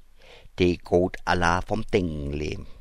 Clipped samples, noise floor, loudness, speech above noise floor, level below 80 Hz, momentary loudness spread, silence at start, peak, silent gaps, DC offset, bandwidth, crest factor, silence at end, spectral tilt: under 0.1%; -48 dBFS; -25 LUFS; 24 dB; -38 dBFS; 9 LU; 0.25 s; -6 dBFS; none; under 0.1%; 12 kHz; 20 dB; 0 s; -6 dB/octave